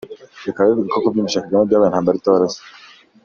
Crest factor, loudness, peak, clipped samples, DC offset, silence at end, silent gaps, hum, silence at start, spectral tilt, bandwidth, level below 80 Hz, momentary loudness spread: 16 dB; -17 LUFS; -2 dBFS; under 0.1%; under 0.1%; 0.55 s; none; none; 0.05 s; -5.5 dB/octave; 7.4 kHz; -58 dBFS; 14 LU